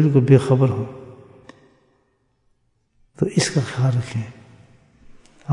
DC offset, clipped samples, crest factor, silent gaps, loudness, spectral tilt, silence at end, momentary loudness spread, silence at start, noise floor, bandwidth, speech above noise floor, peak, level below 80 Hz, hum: under 0.1%; under 0.1%; 20 dB; none; -19 LUFS; -6.5 dB/octave; 0 s; 20 LU; 0 s; -66 dBFS; 11 kHz; 48 dB; -2 dBFS; -58 dBFS; none